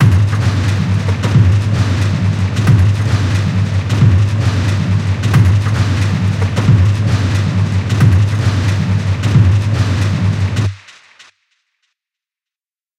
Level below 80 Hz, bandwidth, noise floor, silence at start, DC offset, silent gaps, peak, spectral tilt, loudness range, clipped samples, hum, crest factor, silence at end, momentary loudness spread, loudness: -32 dBFS; 10.5 kHz; under -90 dBFS; 0 s; under 0.1%; none; 0 dBFS; -6.5 dB/octave; 3 LU; under 0.1%; none; 12 dB; 2.2 s; 4 LU; -13 LUFS